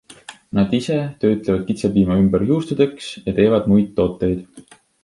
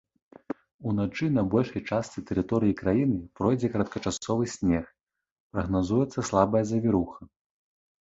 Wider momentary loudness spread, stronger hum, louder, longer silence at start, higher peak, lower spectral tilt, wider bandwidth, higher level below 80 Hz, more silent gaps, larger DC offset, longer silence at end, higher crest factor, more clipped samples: about the same, 8 LU vs 10 LU; neither; first, -18 LUFS vs -27 LUFS; second, 0.1 s vs 0.5 s; first, -2 dBFS vs -6 dBFS; about the same, -7.5 dB/octave vs -7 dB/octave; first, 11.5 kHz vs 8 kHz; first, -42 dBFS vs -50 dBFS; second, none vs 0.74-0.79 s, 5.03-5.07 s, 5.31-5.50 s; neither; second, 0.45 s vs 0.75 s; second, 16 dB vs 22 dB; neither